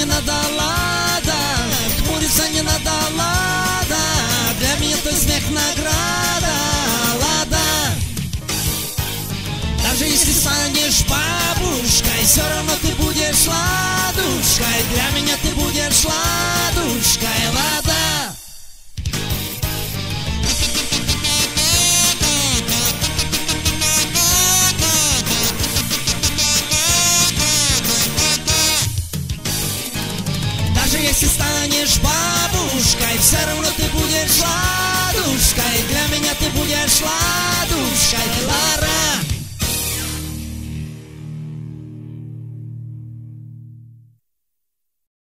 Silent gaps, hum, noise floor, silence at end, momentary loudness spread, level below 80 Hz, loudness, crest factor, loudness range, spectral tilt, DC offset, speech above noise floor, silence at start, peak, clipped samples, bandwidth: none; none; -79 dBFS; 1.35 s; 11 LU; -30 dBFS; -16 LUFS; 18 dB; 6 LU; -2 dB/octave; under 0.1%; 62 dB; 0 s; 0 dBFS; under 0.1%; 16.5 kHz